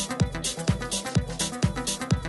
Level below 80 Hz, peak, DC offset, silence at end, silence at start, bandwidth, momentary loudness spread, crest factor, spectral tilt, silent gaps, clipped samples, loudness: -38 dBFS; -10 dBFS; under 0.1%; 0 s; 0 s; 12 kHz; 2 LU; 18 dB; -4 dB/octave; none; under 0.1%; -27 LUFS